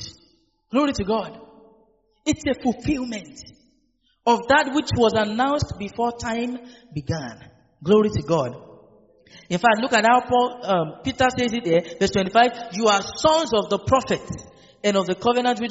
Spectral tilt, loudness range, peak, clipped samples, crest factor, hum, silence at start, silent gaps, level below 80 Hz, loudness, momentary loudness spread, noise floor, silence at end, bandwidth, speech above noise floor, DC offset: -3.5 dB/octave; 6 LU; -2 dBFS; under 0.1%; 20 dB; none; 0 s; none; -48 dBFS; -21 LUFS; 13 LU; -66 dBFS; 0 s; 8 kHz; 45 dB; under 0.1%